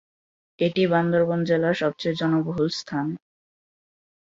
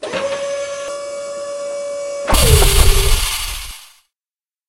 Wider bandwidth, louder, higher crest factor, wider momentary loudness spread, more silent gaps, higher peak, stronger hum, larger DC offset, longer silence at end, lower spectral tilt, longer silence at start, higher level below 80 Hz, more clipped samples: second, 7.8 kHz vs 16 kHz; second, -23 LUFS vs -17 LUFS; about the same, 16 dB vs 16 dB; second, 8 LU vs 15 LU; neither; second, -8 dBFS vs 0 dBFS; neither; neither; first, 1.15 s vs 0.85 s; first, -6.5 dB/octave vs -3 dB/octave; first, 0.6 s vs 0 s; second, -62 dBFS vs -20 dBFS; neither